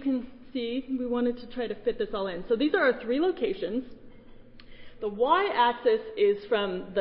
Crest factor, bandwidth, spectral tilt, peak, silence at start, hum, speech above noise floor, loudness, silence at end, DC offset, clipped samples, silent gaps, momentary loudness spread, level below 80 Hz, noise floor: 18 dB; 5.4 kHz; -9 dB/octave; -10 dBFS; 0 s; none; 21 dB; -28 LUFS; 0 s; under 0.1%; under 0.1%; none; 11 LU; -52 dBFS; -48 dBFS